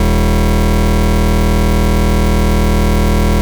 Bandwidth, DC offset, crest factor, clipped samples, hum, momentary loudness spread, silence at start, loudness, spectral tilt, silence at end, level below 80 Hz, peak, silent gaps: over 20 kHz; 3%; 6 dB; under 0.1%; none; 0 LU; 0 s; -13 LUFS; -6.5 dB/octave; 0 s; -14 dBFS; -6 dBFS; none